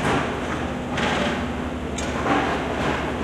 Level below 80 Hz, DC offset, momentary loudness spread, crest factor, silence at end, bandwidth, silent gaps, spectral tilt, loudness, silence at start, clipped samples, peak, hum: -38 dBFS; under 0.1%; 6 LU; 14 dB; 0 s; 14.5 kHz; none; -5 dB/octave; -24 LUFS; 0 s; under 0.1%; -10 dBFS; none